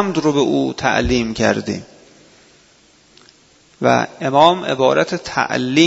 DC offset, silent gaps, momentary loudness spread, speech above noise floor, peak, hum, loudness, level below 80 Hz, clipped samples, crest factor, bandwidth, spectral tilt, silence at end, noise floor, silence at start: under 0.1%; none; 7 LU; 36 dB; 0 dBFS; none; -17 LUFS; -40 dBFS; under 0.1%; 18 dB; 8 kHz; -5 dB/octave; 0 s; -51 dBFS; 0 s